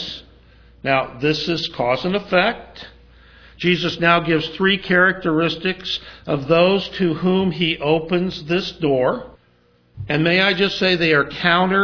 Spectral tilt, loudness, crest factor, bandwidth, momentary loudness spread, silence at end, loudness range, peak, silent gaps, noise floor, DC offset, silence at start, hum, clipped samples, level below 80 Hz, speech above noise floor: -6 dB/octave; -18 LUFS; 20 dB; 5.4 kHz; 10 LU; 0 s; 3 LU; 0 dBFS; none; -57 dBFS; under 0.1%; 0 s; none; under 0.1%; -50 dBFS; 38 dB